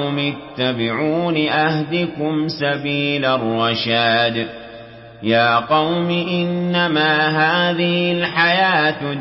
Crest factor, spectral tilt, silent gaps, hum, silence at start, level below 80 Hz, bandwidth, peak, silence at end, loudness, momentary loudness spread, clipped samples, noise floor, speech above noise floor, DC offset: 14 dB; -9.5 dB/octave; none; none; 0 s; -56 dBFS; 5.8 kHz; -4 dBFS; 0 s; -17 LUFS; 7 LU; under 0.1%; -38 dBFS; 20 dB; under 0.1%